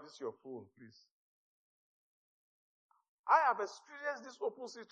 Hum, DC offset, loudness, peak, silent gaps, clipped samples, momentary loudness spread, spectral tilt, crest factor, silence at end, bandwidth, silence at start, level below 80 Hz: none; under 0.1%; -36 LUFS; -16 dBFS; 1.11-2.89 s, 3.08-3.24 s; under 0.1%; 21 LU; -3 dB/octave; 24 dB; 0.1 s; 8.8 kHz; 0 s; under -90 dBFS